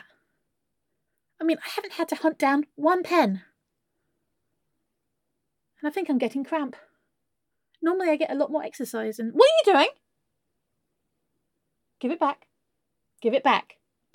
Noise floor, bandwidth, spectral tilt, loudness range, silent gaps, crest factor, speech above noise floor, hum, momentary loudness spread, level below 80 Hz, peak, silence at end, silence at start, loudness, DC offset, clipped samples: -83 dBFS; 17.5 kHz; -4.5 dB/octave; 9 LU; none; 24 dB; 59 dB; none; 12 LU; -84 dBFS; -4 dBFS; 0.55 s; 1.4 s; -24 LUFS; under 0.1%; under 0.1%